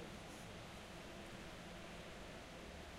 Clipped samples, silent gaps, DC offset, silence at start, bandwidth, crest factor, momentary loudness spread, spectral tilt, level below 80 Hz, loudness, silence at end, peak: under 0.1%; none; under 0.1%; 0 s; 16 kHz; 12 dB; 1 LU; -4 dB/octave; -62 dBFS; -53 LUFS; 0 s; -40 dBFS